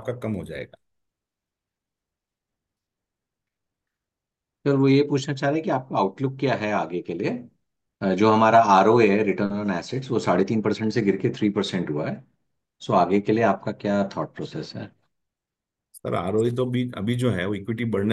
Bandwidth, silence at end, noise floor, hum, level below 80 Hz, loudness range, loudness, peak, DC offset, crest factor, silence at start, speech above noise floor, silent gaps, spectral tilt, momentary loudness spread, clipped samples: 12 kHz; 0 s; -87 dBFS; none; -58 dBFS; 8 LU; -23 LUFS; -4 dBFS; under 0.1%; 20 dB; 0 s; 65 dB; none; -7 dB/octave; 15 LU; under 0.1%